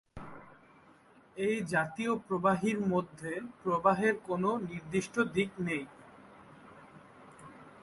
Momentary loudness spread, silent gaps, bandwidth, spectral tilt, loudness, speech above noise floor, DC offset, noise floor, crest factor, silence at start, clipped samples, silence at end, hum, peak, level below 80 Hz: 23 LU; none; 11.5 kHz; -6 dB/octave; -32 LUFS; 29 dB; under 0.1%; -61 dBFS; 22 dB; 0.15 s; under 0.1%; 0.05 s; none; -12 dBFS; -66 dBFS